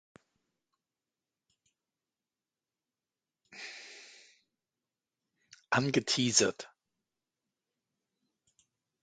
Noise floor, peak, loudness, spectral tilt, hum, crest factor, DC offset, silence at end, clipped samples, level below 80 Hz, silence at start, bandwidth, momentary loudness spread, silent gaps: under -90 dBFS; -10 dBFS; -29 LUFS; -3 dB/octave; none; 30 dB; under 0.1%; 2.35 s; under 0.1%; -78 dBFS; 3.5 s; 9 kHz; 23 LU; none